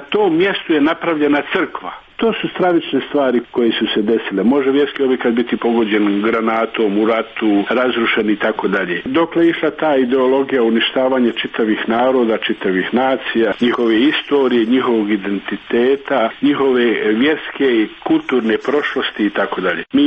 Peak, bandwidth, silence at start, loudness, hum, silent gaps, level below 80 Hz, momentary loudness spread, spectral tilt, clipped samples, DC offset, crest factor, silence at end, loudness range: -4 dBFS; 6 kHz; 0 s; -16 LUFS; none; none; -54 dBFS; 4 LU; -7 dB/octave; under 0.1%; under 0.1%; 12 dB; 0 s; 1 LU